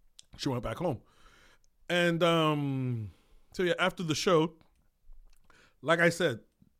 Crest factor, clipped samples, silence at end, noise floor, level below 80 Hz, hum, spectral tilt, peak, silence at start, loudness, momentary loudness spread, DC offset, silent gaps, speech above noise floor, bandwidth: 20 dB; under 0.1%; 0.4 s; -61 dBFS; -58 dBFS; none; -5 dB/octave; -12 dBFS; 0.4 s; -29 LUFS; 13 LU; under 0.1%; none; 33 dB; 16 kHz